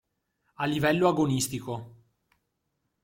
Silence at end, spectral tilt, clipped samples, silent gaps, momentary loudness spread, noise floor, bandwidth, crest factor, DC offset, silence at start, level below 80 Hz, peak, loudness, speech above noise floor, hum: 1.15 s; -5 dB/octave; under 0.1%; none; 13 LU; -79 dBFS; 16.5 kHz; 20 dB; under 0.1%; 0.6 s; -62 dBFS; -10 dBFS; -27 LUFS; 53 dB; none